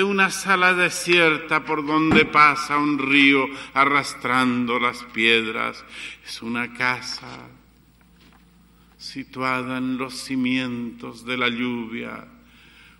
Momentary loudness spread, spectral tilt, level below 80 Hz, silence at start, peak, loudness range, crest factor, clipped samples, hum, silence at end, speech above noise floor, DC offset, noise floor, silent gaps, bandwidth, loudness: 18 LU; -4 dB/octave; -54 dBFS; 0 s; -2 dBFS; 13 LU; 20 dB; under 0.1%; none; 0.75 s; 33 dB; under 0.1%; -54 dBFS; none; 16 kHz; -20 LUFS